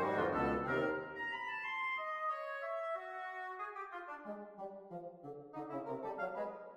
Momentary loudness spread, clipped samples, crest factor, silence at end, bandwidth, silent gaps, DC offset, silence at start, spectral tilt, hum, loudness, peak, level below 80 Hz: 14 LU; under 0.1%; 18 dB; 0 s; 15 kHz; none; under 0.1%; 0 s; -6.5 dB/octave; none; -41 LUFS; -22 dBFS; -66 dBFS